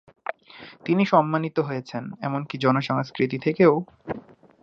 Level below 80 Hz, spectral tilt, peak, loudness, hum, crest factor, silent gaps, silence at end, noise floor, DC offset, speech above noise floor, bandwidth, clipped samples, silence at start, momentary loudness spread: -66 dBFS; -8 dB/octave; -4 dBFS; -23 LUFS; none; 20 dB; none; 0.45 s; -46 dBFS; under 0.1%; 24 dB; 7.4 kHz; under 0.1%; 0.55 s; 17 LU